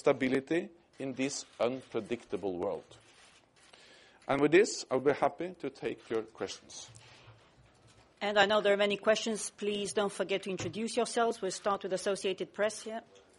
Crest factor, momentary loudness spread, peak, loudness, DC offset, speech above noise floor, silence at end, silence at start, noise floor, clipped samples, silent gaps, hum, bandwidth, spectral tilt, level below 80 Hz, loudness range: 22 dB; 15 LU; -12 dBFS; -32 LUFS; under 0.1%; 30 dB; 0.35 s; 0.05 s; -62 dBFS; under 0.1%; none; none; 11.5 kHz; -3.5 dB/octave; -70 dBFS; 7 LU